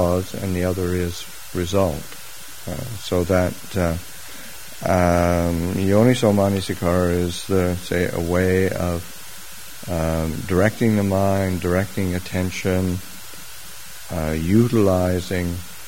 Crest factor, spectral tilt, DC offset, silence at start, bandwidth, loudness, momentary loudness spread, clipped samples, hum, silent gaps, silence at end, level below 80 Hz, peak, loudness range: 20 dB; -6 dB/octave; 2%; 0 s; 16.5 kHz; -21 LUFS; 18 LU; under 0.1%; none; none; 0 s; -40 dBFS; -2 dBFS; 5 LU